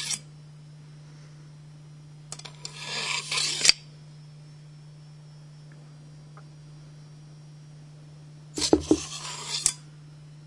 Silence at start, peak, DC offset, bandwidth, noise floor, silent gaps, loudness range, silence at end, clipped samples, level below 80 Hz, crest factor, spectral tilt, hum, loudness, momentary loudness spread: 0 s; 0 dBFS; under 0.1%; 11.5 kHz; -47 dBFS; none; 20 LU; 0 s; under 0.1%; -58 dBFS; 32 dB; -2 dB/octave; none; -26 LUFS; 24 LU